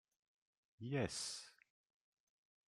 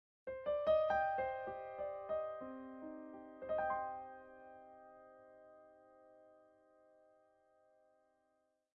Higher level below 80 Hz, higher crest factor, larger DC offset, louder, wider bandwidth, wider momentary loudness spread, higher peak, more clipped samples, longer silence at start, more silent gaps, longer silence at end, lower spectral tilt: about the same, -78 dBFS vs -74 dBFS; about the same, 24 dB vs 20 dB; neither; second, -45 LUFS vs -41 LUFS; first, 14 kHz vs 6 kHz; second, 14 LU vs 25 LU; about the same, -26 dBFS vs -24 dBFS; neither; first, 0.8 s vs 0.25 s; neither; second, 1.15 s vs 2.4 s; about the same, -4 dB/octave vs -3 dB/octave